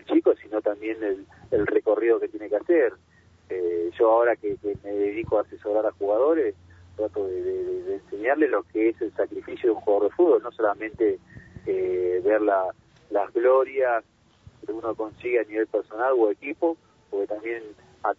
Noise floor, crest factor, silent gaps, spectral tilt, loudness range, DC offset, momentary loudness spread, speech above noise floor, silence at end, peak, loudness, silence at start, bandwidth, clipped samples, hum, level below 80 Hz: -53 dBFS; 16 dB; none; -8 dB/octave; 3 LU; under 0.1%; 10 LU; 29 dB; 0.05 s; -8 dBFS; -25 LUFS; 0.1 s; 4.2 kHz; under 0.1%; none; -60 dBFS